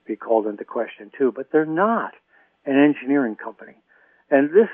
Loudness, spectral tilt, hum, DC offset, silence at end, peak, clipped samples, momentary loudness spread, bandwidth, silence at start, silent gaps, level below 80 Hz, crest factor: -21 LUFS; -10.5 dB/octave; none; under 0.1%; 0 s; -4 dBFS; under 0.1%; 15 LU; 3.5 kHz; 0.1 s; none; -80 dBFS; 18 dB